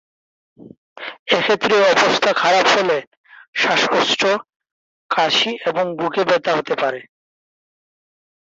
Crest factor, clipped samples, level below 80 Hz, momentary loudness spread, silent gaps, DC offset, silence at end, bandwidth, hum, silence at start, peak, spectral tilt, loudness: 18 dB; under 0.1%; -66 dBFS; 10 LU; 0.77-0.96 s, 1.19-1.26 s, 3.07-3.24 s, 3.48-3.53 s, 4.56-4.60 s, 4.72-5.09 s; under 0.1%; 1.45 s; 8 kHz; none; 0.6 s; -2 dBFS; -2.5 dB/octave; -17 LUFS